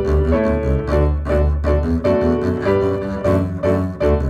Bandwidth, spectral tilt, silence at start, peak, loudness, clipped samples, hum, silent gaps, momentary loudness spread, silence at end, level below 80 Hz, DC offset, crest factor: 7.2 kHz; -9 dB/octave; 0 s; -4 dBFS; -18 LUFS; under 0.1%; none; none; 2 LU; 0 s; -22 dBFS; under 0.1%; 12 dB